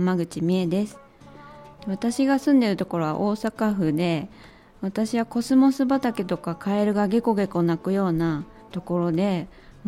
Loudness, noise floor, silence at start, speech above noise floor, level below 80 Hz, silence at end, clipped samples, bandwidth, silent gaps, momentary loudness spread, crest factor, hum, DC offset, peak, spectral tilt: -24 LUFS; -46 dBFS; 0 s; 23 dB; -54 dBFS; 0 s; under 0.1%; 15 kHz; none; 12 LU; 16 dB; none; under 0.1%; -8 dBFS; -7 dB/octave